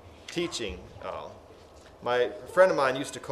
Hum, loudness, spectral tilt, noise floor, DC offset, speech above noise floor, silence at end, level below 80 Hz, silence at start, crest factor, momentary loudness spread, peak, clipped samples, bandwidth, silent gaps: none; -28 LUFS; -4 dB/octave; -51 dBFS; under 0.1%; 23 dB; 0 s; -56 dBFS; 0.05 s; 22 dB; 17 LU; -8 dBFS; under 0.1%; 13.5 kHz; none